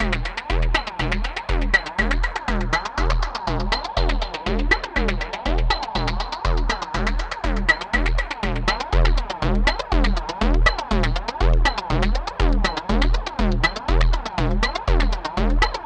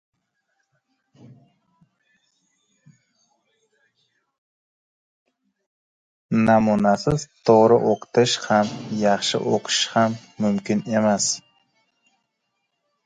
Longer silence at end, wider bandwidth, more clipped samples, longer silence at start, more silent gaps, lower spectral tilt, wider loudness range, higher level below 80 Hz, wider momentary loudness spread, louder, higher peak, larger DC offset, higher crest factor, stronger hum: second, 0 s vs 1.7 s; second, 8.6 kHz vs 9.6 kHz; neither; second, 0 s vs 6.3 s; neither; about the same, -5 dB/octave vs -4.5 dB/octave; second, 2 LU vs 5 LU; first, -22 dBFS vs -56 dBFS; second, 5 LU vs 8 LU; about the same, -22 LUFS vs -20 LUFS; about the same, -2 dBFS vs -2 dBFS; neither; about the same, 18 dB vs 22 dB; neither